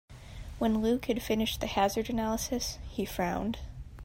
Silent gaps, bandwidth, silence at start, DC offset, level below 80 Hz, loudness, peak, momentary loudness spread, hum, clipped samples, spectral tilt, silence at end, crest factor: none; 16 kHz; 0.1 s; under 0.1%; -46 dBFS; -31 LUFS; -14 dBFS; 14 LU; none; under 0.1%; -4.5 dB/octave; 0 s; 18 dB